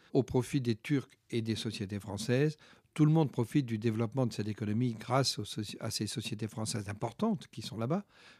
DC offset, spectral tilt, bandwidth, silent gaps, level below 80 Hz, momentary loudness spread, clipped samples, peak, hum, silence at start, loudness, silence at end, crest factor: under 0.1%; -6 dB/octave; 14.5 kHz; none; -66 dBFS; 8 LU; under 0.1%; -14 dBFS; none; 0.15 s; -34 LUFS; 0.05 s; 20 dB